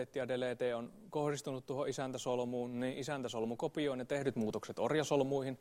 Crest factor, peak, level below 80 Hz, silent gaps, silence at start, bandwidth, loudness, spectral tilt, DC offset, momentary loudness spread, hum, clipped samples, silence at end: 18 dB; -20 dBFS; -72 dBFS; none; 0 s; 16 kHz; -38 LUFS; -5.5 dB/octave; under 0.1%; 6 LU; none; under 0.1%; 0.05 s